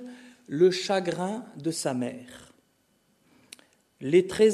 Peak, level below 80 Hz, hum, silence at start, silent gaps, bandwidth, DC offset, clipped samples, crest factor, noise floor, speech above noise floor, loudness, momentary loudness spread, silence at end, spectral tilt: -8 dBFS; -68 dBFS; none; 0 s; none; 13.5 kHz; under 0.1%; under 0.1%; 18 dB; -68 dBFS; 43 dB; -27 LUFS; 22 LU; 0 s; -5 dB/octave